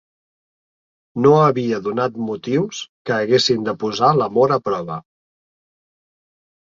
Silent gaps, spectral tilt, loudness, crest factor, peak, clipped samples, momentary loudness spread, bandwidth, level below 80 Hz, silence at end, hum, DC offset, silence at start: 2.89-3.05 s; -5.5 dB/octave; -18 LUFS; 18 dB; -2 dBFS; under 0.1%; 12 LU; 7.8 kHz; -62 dBFS; 1.7 s; none; under 0.1%; 1.15 s